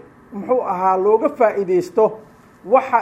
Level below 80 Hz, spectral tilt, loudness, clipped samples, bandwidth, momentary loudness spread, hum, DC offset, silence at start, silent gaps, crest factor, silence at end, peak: -62 dBFS; -7 dB/octave; -18 LUFS; under 0.1%; 12.5 kHz; 12 LU; none; under 0.1%; 0.3 s; none; 16 dB; 0 s; -2 dBFS